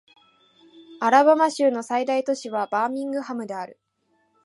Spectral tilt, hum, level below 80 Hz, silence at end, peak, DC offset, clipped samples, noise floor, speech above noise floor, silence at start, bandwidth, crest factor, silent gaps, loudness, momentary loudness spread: -4 dB/octave; none; -82 dBFS; 0.7 s; -2 dBFS; under 0.1%; under 0.1%; -68 dBFS; 47 dB; 0.8 s; 11.5 kHz; 22 dB; none; -22 LUFS; 14 LU